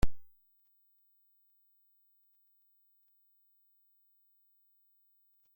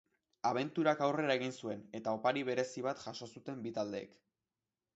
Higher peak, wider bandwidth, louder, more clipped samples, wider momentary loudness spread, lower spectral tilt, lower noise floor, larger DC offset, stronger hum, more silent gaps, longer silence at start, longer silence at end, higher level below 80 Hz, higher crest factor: first, -14 dBFS vs -18 dBFS; first, 16.5 kHz vs 8 kHz; second, -58 LUFS vs -37 LUFS; neither; second, 0 LU vs 13 LU; first, -6 dB/octave vs -4 dB/octave; second, -71 dBFS vs under -90 dBFS; neither; first, 50 Hz at -120 dBFS vs none; neither; second, 0.05 s vs 0.45 s; first, 5.35 s vs 0.9 s; first, -48 dBFS vs -82 dBFS; about the same, 24 dB vs 20 dB